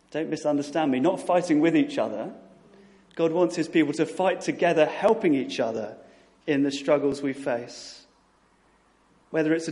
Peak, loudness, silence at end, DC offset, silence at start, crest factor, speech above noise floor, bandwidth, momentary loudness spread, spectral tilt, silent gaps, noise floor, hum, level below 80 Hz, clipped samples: -8 dBFS; -25 LUFS; 0 s; under 0.1%; 0.1 s; 18 dB; 38 dB; 11.5 kHz; 13 LU; -5.5 dB/octave; none; -62 dBFS; none; -70 dBFS; under 0.1%